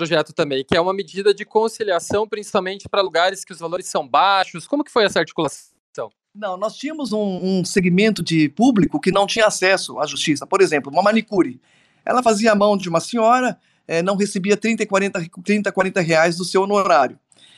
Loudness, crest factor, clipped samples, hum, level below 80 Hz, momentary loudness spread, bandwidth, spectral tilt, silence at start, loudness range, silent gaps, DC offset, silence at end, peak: -19 LUFS; 16 dB; under 0.1%; none; -56 dBFS; 10 LU; 13 kHz; -4.5 dB/octave; 0 s; 4 LU; 5.80-5.93 s; under 0.1%; 0.45 s; -4 dBFS